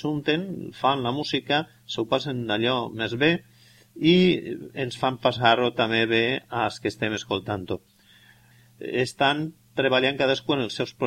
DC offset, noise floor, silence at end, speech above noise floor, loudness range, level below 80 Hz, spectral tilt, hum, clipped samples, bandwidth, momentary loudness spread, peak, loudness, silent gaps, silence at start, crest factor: under 0.1%; -55 dBFS; 0 s; 31 dB; 5 LU; -60 dBFS; -5.5 dB/octave; none; under 0.1%; 15.5 kHz; 11 LU; -4 dBFS; -24 LUFS; none; 0 s; 20 dB